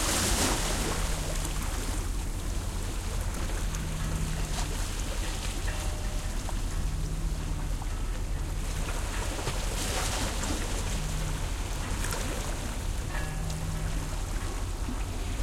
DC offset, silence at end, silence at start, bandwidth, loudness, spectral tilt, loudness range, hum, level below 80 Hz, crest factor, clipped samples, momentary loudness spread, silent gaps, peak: under 0.1%; 0 s; 0 s; 16.5 kHz; -33 LUFS; -3.5 dB/octave; 2 LU; none; -32 dBFS; 16 dB; under 0.1%; 5 LU; none; -14 dBFS